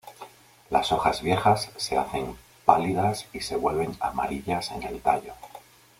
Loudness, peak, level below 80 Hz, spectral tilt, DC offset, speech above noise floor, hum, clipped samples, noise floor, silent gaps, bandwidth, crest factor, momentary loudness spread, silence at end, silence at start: -26 LUFS; -2 dBFS; -52 dBFS; -5 dB/octave; under 0.1%; 22 dB; none; under 0.1%; -48 dBFS; none; 16.5 kHz; 24 dB; 19 LU; 0.4 s; 0.05 s